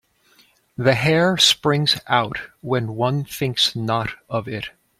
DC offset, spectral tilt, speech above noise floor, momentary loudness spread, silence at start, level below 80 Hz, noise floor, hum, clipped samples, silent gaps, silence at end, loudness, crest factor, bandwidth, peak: under 0.1%; -4 dB/octave; 37 dB; 13 LU; 0.8 s; -54 dBFS; -57 dBFS; none; under 0.1%; none; 0.3 s; -19 LUFS; 20 dB; 16 kHz; -2 dBFS